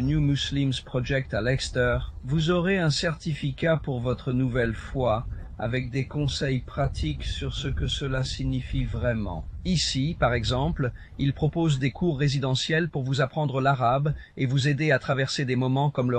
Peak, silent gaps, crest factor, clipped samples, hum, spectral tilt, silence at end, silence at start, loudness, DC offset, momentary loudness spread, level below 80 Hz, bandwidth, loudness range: -8 dBFS; none; 16 dB; under 0.1%; none; -6 dB/octave; 0 s; 0 s; -26 LUFS; under 0.1%; 7 LU; -38 dBFS; 9.6 kHz; 4 LU